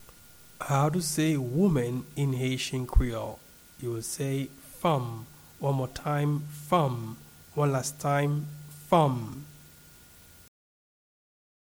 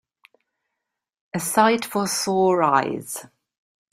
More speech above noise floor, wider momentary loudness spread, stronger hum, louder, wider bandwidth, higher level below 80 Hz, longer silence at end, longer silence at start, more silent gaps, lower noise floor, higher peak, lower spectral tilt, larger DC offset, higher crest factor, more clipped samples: second, 26 dB vs 62 dB; about the same, 15 LU vs 14 LU; neither; second, -29 LUFS vs -21 LUFS; first, over 20 kHz vs 16 kHz; first, -40 dBFS vs -66 dBFS; first, 2.1 s vs 0.7 s; second, 0 s vs 1.35 s; neither; second, -54 dBFS vs -83 dBFS; second, -10 dBFS vs -2 dBFS; first, -6 dB/octave vs -4 dB/octave; neither; about the same, 20 dB vs 22 dB; neither